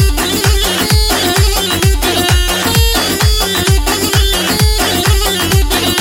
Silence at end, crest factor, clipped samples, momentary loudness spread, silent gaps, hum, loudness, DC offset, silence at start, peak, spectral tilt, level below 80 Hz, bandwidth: 0 s; 12 dB; under 0.1%; 1 LU; none; none; -11 LUFS; under 0.1%; 0 s; 0 dBFS; -3.5 dB/octave; -16 dBFS; 17 kHz